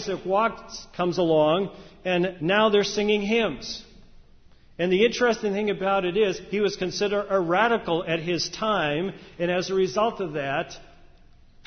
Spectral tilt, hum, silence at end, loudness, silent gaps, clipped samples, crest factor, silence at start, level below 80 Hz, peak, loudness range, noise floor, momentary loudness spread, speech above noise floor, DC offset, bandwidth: -5 dB/octave; none; 0.8 s; -24 LUFS; none; under 0.1%; 18 dB; 0 s; -54 dBFS; -8 dBFS; 2 LU; -52 dBFS; 9 LU; 28 dB; under 0.1%; 6.6 kHz